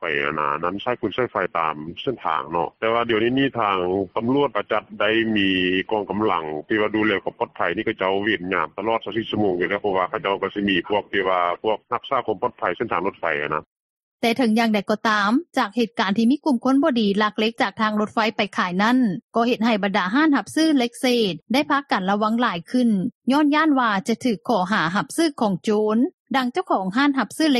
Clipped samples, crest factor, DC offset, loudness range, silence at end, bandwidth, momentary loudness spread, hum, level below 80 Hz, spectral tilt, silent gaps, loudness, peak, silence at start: under 0.1%; 16 dB; under 0.1%; 3 LU; 0 s; 13 kHz; 6 LU; none; -60 dBFS; -5 dB/octave; 13.67-14.18 s, 19.22-19.29 s, 23.15-23.21 s, 26.14-26.25 s; -21 LUFS; -4 dBFS; 0 s